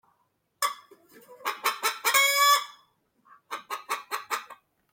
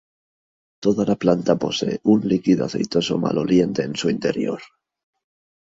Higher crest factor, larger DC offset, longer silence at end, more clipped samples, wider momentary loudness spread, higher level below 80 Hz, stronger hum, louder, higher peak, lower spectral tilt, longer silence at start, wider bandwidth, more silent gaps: about the same, 20 dB vs 20 dB; neither; second, 0.4 s vs 1 s; neither; first, 20 LU vs 5 LU; second, -84 dBFS vs -56 dBFS; neither; second, -26 LUFS vs -21 LUFS; second, -8 dBFS vs -2 dBFS; second, 3 dB/octave vs -6 dB/octave; second, 0.6 s vs 0.8 s; first, 17 kHz vs 7.8 kHz; neither